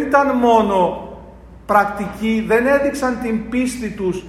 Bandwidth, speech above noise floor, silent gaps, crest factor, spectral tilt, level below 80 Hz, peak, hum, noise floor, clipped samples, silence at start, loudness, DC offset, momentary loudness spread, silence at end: 15 kHz; 22 dB; none; 16 dB; -5.5 dB/octave; -42 dBFS; -2 dBFS; none; -39 dBFS; under 0.1%; 0 s; -17 LUFS; under 0.1%; 9 LU; 0 s